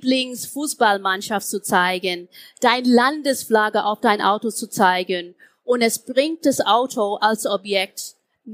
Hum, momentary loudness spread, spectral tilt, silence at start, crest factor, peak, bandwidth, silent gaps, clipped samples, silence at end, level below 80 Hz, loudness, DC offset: none; 9 LU; -3 dB/octave; 0 s; 18 dB; -2 dBFS; 15.5 kHz; none; under 0.1%; 0 s; -72 dBFS; -20 LUFS; under 0.1%